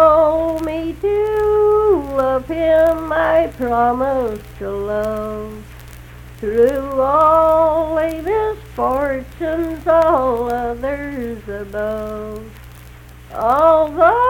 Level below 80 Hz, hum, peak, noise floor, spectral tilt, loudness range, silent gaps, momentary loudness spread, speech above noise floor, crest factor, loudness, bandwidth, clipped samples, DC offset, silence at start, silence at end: -36 dBFS; 60 Hz at -40 dBFS; 0 dBFS; -38 dBFS; -7 dB/octave; 5 LU; none; 14 LU; 21 dB; 16 dB; -17 LUFS; 17.5 kHz; under 0.1%; under 0.1%; 0 s; 0 s